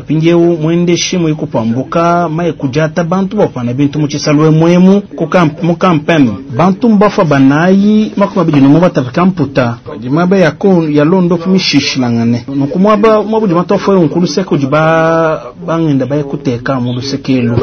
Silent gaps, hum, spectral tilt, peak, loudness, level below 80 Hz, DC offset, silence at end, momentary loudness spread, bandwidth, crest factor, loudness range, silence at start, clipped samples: none; none; -6.5 dB/octave; 0 dBFS; -10 LUFS; -42 dBFS; under 0.1%; 0 s; 7 LU; 6.6 kHz; 10 dB; 3 LU; 0 s; 0.5%